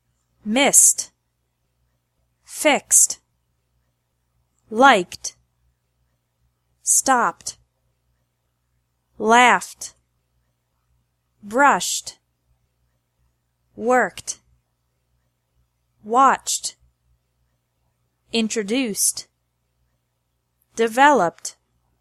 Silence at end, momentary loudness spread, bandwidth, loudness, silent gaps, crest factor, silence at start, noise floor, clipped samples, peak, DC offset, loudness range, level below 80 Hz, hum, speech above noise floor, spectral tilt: 0.5 s; 20 LU; 15.5 kHz; -17 LUFS; none; 22 dB; 0.45 s; -72 dBFS; under 0.1%; 0 dBFS; under 0.1%; 7 LU; -66 dBFS; 60 Hz at -60 dBFS; 54 dB; -1 dB/octave